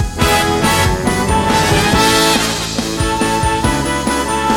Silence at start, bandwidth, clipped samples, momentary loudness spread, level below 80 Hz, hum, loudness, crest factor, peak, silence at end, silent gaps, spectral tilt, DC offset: 0 s; 18.5 kHz; under 0.1%; 5 LU; -26 dBFS; none; -13 LUFS; 14 dB; 0 dBFS; 0 s; none; -3.5 dB/octave; 0.2%